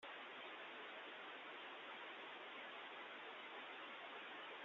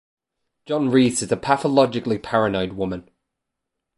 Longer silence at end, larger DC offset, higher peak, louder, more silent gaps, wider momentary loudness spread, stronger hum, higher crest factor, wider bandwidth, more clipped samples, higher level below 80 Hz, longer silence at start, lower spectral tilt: second, 0 s vs 0.95 s; neither; second, -42 dBFS vs -2 dBFS; second, -53 LUFS vs -21 LUFS; neither; second, 1 LU vs 10 LU; neither; second, 12 dB vs 20 dB; second, 7.4 kHz vs 11.5 kHz; neither; second, under -90 dBFS vs -52 dBFS; second, 0 s vs 0.7 s; second, 1.5 dB/octave vs -5 dB/octave